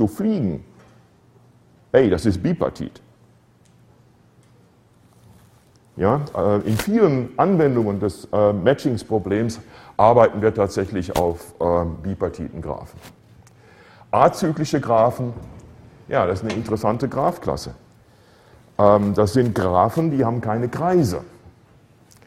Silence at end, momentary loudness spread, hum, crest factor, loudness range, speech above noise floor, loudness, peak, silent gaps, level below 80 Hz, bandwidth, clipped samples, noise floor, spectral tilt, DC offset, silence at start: 0.8 s; 14 LU; none; 20 dB; 6 LU; 35 dB; -20 LUFS; 0 dBFS; none; -46 dBFS; 16 kHz; under 0.1%; -54 dBFS; -7 dB/octave; under 0.1%; 0 s